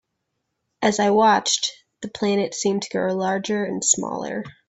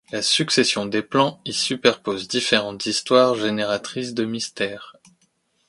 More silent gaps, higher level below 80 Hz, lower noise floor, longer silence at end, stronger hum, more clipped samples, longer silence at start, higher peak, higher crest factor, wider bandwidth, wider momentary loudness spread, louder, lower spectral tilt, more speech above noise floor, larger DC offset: neither; about the same, -64 dBFS vs -64 dBFS; first, -77 dBFS vs -66 dBFS; second, 0.2 s vs 0.75 s; neither; neither; first, 0.8 s vs 0.1 s; about the same, -2 dBFS vs 0 dBFS; about the same, 20 dB vs 22 dB; second, 8.4 kHz vs 11.5 kHz; about the same, 11 LU vs 9 LU; about the same, -21 LUFS vs -21 LUFS; about the same, -3 dB/octave vs -3 dB/octave; first, 55 dB vs 44 dB; neither